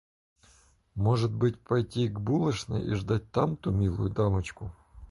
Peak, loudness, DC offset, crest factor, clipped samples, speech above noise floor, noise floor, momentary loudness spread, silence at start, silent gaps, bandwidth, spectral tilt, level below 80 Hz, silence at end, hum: -12 dBFS; -29 LUFS; under 0.1%; 18 dB; under 0.1%; 34 dB; -62 dBFS; 5 LU; 0.95 s; none; 11.5 kHz; -7.5 dB/octave; -46 dBFS; 0.05 s; none